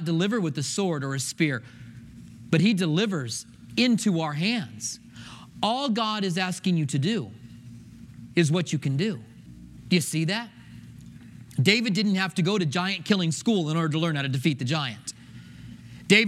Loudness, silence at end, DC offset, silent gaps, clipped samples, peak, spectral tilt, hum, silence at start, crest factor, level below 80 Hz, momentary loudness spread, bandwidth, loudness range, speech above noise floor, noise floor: -25 LUFS; 0 s; under 0.1%; none; under 0.1%; -4 dBFS; -5 dB/octave; none; 0 s; 22 dB; -62 dBFS; 23 LU; 15 kHz; 3 LU; 21 dB; -46 dBFS